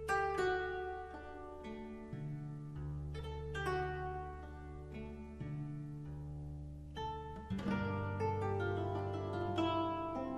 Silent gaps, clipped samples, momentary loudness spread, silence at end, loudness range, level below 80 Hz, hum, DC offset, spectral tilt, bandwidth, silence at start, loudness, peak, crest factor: none; under 0.1%; 13 LU; 0 s; 7 LU; -54 dBFS; none; under 0.1%; -7 dB/octave; 13 kHz; 0 s; -41 LUFS; -24 dBFS; 18 dB